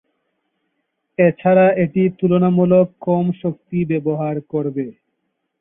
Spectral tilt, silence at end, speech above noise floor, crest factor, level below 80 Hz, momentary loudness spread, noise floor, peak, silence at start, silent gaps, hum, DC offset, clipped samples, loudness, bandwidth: -13.5 dB/octave; 0.7 s; 56 dB; 16 dB; -58 dBFS; 11 LU; -73 dBFS; -2 dBFS; 1.2 s; none; none; under 0.1%; under 0.1%; -17 LUFS; 3.8 kHz